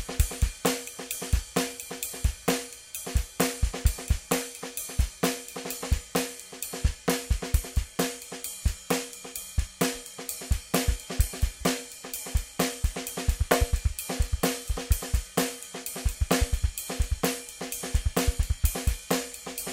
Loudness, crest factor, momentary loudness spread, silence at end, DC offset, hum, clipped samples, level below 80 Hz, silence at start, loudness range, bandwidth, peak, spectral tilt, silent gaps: -30 LUFS; 22 dB; 8 LU; 0 s; under 0.1%; none; under 0.1%; -32 dBFS; 0 s; 2 LU; 17 kHz; -6 dBFS; -4 dB/octave; none